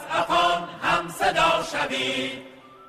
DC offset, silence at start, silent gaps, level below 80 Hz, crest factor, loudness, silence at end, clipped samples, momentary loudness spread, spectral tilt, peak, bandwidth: under 0.1%; 0 s; none; -52 dBFS; 16 dB; -23 LUFS; 0 s; under 0.1%; 7 LU; -3 dB/octave; -8 dBFS; 15.5 kHz